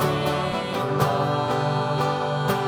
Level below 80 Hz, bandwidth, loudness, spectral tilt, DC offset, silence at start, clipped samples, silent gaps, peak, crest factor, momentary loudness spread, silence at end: -54 dBFS; over 20 kHz; -24 LUFS; -6 dB/octave; under 0.1%; 0 s; under 0.1%; none; -8 dBFS; 14 dB; 3 LU; 0 s